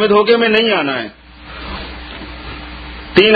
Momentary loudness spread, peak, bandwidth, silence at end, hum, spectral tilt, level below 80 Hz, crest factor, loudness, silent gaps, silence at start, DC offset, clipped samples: 19 LU; 0 dBFS; 5 kHz; 0 s; none; -7 dB/octave; -36 dBFS; 16 dB; -13 LUFS; none; 0 s; under 0.1%; under 0.1%